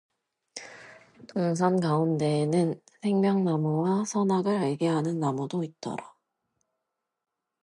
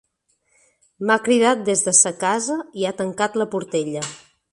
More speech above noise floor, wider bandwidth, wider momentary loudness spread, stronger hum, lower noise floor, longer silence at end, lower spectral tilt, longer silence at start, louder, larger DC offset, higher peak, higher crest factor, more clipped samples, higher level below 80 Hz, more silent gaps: first, 58 dB vs 47 dB; about the same, 11.5 kHz vs 11.5 kHz; about the same, 14 LU vs 12 LU; neither; first, -84 dBFS vs -68 dBFS; first, 1.55 s vs 0.35 s; first, -7 dB/octave vs -2.5 dB/octave; second, 0.55 s vs 1 s; second, -27 LUFS vs -19 LUFS; neither; second, -10 dBFS vs 0 dBFS; about the same, 18 dB vs 22 dB; neither; second, -74 dBFS vs -66 dBFS; neither